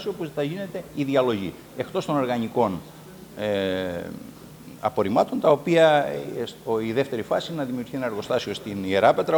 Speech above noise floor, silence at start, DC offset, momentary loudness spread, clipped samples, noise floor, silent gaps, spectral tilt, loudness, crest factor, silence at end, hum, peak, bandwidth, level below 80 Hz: 19 dB; 0 s; under 0.1%; 15 LU; under 0.1%; -43 dBFS; none; -6 dB/octave; -24 LUFS; 20 dB; 0 s; none; -4 dBFS; over 20 kHz; -60 dBFS